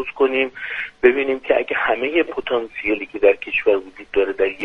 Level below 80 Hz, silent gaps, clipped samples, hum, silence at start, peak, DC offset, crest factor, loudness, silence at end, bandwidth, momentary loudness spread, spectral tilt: -52 dBFS; none; under 0.1%; none; 0 s; 0 dBFS; under 0.1%; 20 dB; -19 LUFS; 0 s; 5.2 kHz; 7 LU; -5.5 dB/octave